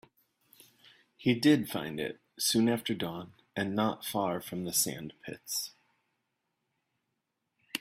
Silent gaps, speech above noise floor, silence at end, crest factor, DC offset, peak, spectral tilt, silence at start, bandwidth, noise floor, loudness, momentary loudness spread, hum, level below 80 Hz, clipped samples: none; 52 dB; 0 s; 22 dB; under 0.1%; -12 dBFS; -3.5 dB/octave; 1.2 s; 16 kHz; -83 dBFS; -31 LUFS; 15 LU; none; -70 dBFS; under 0.1%